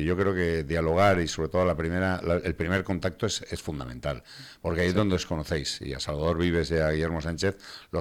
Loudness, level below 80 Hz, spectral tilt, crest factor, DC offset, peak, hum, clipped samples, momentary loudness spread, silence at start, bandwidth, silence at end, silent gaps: -27 LUFS; -42 dBFS; -5.5 dB/octave; 18 dB; under 0.1%; -10 dBFS; none; under 0.1%; 10 LU; 0 s; 16 kHz; 0 s; none